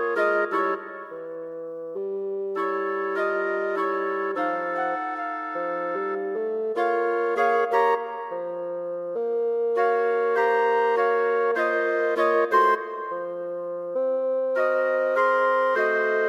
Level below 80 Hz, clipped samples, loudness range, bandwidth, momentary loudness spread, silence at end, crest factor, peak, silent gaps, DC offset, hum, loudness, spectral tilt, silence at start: -78 dBFS; under 0.1%; 5 LU; 7.8 kHz; 10 LU; 0 s; 16 dB; -8 dBFS; none; under 0.1%; none; -24 LUFS; -5 dB/octave; 0 s